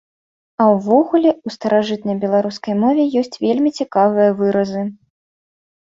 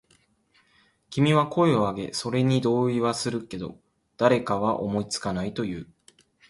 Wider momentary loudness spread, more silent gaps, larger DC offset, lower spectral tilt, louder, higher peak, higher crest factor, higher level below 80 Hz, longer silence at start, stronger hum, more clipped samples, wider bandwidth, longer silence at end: second, 8 LU vs 12 LU; neither; neither; about the same, -7 dB/octave vs -6 dB/octave; first, -17 LUFS vs -25 LUFS; first, -2 dBFS vs -8 dBFS; about the same, 16 dB vs 18 dB; about the same, -62 dBFS vs -58 dBFS; second, 0.6 s vs 1.1 s; neither; neither; second, 7.6 kHz vs 11.5 kHz; first, 1 s vs 0.65 s